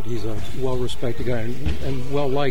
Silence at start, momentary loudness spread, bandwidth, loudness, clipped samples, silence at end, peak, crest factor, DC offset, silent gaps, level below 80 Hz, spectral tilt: 0 s; 5 LU; 16.5 kHz; -26 LUFS; under 0.1%; 0 s; -6 dBFS; 16 dB; 20%; none; -34 dBFS; -6.5 dB/octave